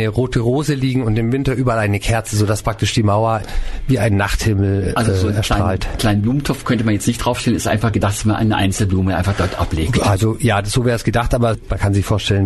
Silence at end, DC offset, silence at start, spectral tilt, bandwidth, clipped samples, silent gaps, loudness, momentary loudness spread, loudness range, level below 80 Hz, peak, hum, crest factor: 0 s; under 0.1%; 0 s; -6 dB/octave; 12.5 kHz; under 0.1%; none; -17 LUFS; 3 LU; 1 LU; -28 dBFS; -6 dBFS; none; 10 dB